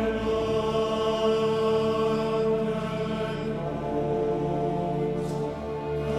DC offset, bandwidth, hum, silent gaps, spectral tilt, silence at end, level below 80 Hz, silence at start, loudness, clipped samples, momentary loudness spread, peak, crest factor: under 0.1%; 12 kHz; none; none; -7 dB/octave; 0 s; -46 dBFS; 0 s; -27 LUFS; under 0.1%; 6 LU; -14 dBFS; 12 dB